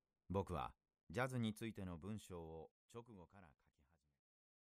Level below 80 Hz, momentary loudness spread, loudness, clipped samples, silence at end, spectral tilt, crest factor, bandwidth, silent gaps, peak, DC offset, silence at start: -68 dBFS; 18 LU; -48 LUFS; under 0.1%; 1.2 s; -6.5 dB/octave; 22 dB; 15 kHz; 1.03-1.07 s, 2.71-2.89 s; -28 dBFS; under 0.1%; 0.3 s